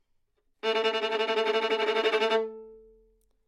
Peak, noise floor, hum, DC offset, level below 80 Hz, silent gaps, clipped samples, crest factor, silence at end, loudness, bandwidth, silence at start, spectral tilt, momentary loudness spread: -14 dBFS; -71 dBFS; none; under 0.1%; -72 dBFS; none; under 0.1%; 16 dB; 0.7 s; -27 LUFS; 11.5 kHz; 0.65 s; -2 dB/octave; 8 LU